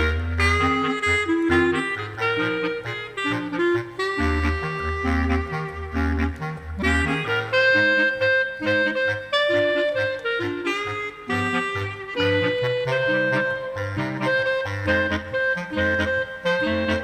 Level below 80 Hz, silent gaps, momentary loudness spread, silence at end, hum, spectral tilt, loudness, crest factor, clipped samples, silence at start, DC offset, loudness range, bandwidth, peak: -36 dBFS; none; 8 LU; 0 s; none; -5.5 dB/octave; -22 LUFS; 16 dB; under 0.1%; 0 s; under 0.1%; 4 LU; 13.5 kHz; -8 dBFS